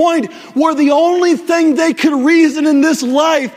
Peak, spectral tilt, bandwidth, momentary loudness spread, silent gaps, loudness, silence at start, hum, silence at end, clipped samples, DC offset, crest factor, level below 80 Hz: 0 dBFS; -3.5 dB/octave; 15.5 kHz; 4 LU; none; -12 LUFS; 0 s; none; 0 s; under 0.1%; under 0.1%; 12 dB; -62 dBFS